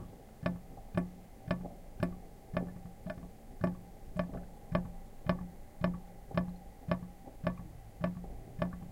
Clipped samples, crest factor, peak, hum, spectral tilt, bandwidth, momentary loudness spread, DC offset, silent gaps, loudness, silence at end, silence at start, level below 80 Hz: under 0.1%; 24 dB; -14 dBFS; none; -8 dB/octave; 16 kHz; 11 LU; under 0.1%; none; -40 LUFS; 0 s; 0 s; -50 dBFS